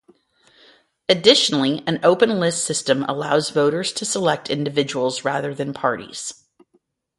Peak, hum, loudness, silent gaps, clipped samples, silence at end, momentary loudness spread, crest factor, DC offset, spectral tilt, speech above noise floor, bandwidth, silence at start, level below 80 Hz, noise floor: 0 dBFS; none; -19 LUFS; none; under 0.1%; 0.85 s; 11 LU; 20 dB; under 0.1%; -3.5 dB/octave; 45 dB; 11.5 kHz; 1.1 s; -64 dBFS; -65 dBFS